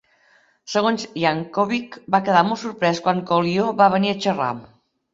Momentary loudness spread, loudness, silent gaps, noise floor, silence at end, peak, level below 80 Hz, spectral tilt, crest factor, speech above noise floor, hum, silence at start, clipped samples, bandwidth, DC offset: 8 LU; -20 LUFS; none; -58 dBFS; 0.5 s; -2 dBFS; -64 dBFS; -5.5 dB/octave; 20 dB; 38 dB; none; 0.65 s; under 0.1%; 7.8 kHz; under 0.1%